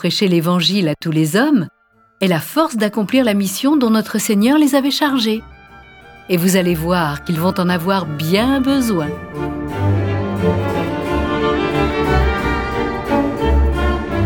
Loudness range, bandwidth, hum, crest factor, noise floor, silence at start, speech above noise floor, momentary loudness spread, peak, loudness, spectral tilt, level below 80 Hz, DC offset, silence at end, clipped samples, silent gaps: 3 LU; 19 kHz; none; 16 dB; -41 dBFS; 0 s; 25 dB; 6 LU; 0 dBFS; -16 LUFS; -5.5 dB/octave; -28 dBFS; under 0.1%; 0 s; under 0.1%; none